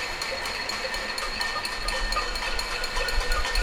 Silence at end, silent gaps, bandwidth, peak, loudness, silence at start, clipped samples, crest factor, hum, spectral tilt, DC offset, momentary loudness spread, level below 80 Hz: 0 s; none; 17 kHz; -12 dBFS; -28 LUFS; 0 s; under 0.1%; 16 dB; none; -1.5 dB/octave; under 0.1%; 2 LU; -32 dBFS